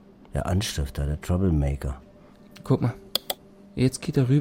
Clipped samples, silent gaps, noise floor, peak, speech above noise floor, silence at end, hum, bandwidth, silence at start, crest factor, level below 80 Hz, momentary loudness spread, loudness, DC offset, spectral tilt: under 0.1%; none; -50 dBFS; -6 dBFS; 26 dB; 0 s; none; 16.5 kHz; 0.35 s; 20 dB; -36 dBFS; 11 LU; -27 LUFS; under 0.1%; -6 dB/octave